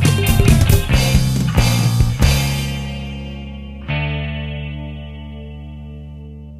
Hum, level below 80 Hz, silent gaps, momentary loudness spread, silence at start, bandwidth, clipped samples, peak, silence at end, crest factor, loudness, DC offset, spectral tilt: none; -22 dBFS; none; 19 LU; 0 s; 16 kHz; under 0.1%; 0 dBFS; 0 s; 18 dB; -17 LUFS; under 0.1%; -5 dB/octave